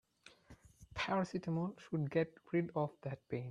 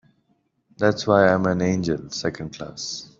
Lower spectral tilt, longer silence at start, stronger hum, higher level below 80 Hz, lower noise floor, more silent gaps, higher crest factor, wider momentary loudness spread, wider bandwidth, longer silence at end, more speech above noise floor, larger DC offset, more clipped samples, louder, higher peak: first, -7 dB/octave vs -5.5 dB/octave; second, 0.25 s vs 0.8 s; neither; second, -68 dBFS vs -56 dBFS; second, -63 dBFS vs -68 dBFS; neither; about the same, 20 dB vs 20 dB; second, 9 LU vs 14 LU; first, 10.5 kHz vs 7.6 kHz; second, 0 s vs 0.15 s; second, 24 dB vs 46 dB; neither; neither; second, -40 LUFS vs -22 LUFS; second, -20 dBFS vs -2 dBFS